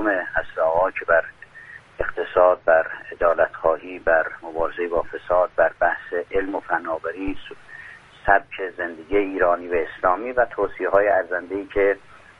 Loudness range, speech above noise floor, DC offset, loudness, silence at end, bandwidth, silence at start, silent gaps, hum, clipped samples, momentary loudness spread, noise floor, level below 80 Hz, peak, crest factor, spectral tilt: 3 LU; 22 dB; under 0.1%; -22 LUFS; 0.4 s; 4.9 kHz; 0 s; none; none; under 0.1%; 12 LU; -44 dBFS; -46 dBFS; 0 dBFS; 22 dB; -7 dB/octave